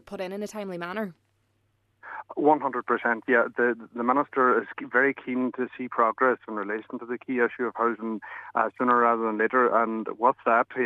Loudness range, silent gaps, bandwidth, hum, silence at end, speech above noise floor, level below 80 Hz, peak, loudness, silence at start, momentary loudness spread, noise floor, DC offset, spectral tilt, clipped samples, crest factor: 3 LU; none; 12.5 kHz; none; 0 s; 45 dB; -76 dBFS; -6 dBFS; -26 LUFS; 0.1 s; 12 LU; -70 dBFS; under 0.1%; -6.5 dB/octave; under 0.1%; 20 dB